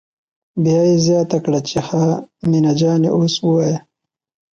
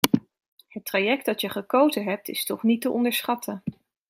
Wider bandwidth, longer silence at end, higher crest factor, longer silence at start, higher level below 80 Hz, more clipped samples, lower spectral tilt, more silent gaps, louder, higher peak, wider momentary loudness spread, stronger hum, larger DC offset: second, 7.6 kHz vs 16.5 kHz; first, 0.75 s vs 0.4 s; second, 12 dB vs 26 dB; first, 0.55 s vs 0.05 s; first, -54 dBFS vs -66 dBFS; neither; first, -6.5 dB/octave vs -4 dB/octave; second, none vs 0.48-0.57 s; first, -16 LUFS vs -25 LUFS; second, -4 dBFS vs 0 dBFS; second, 7 LU vs 13 LU; neither; neither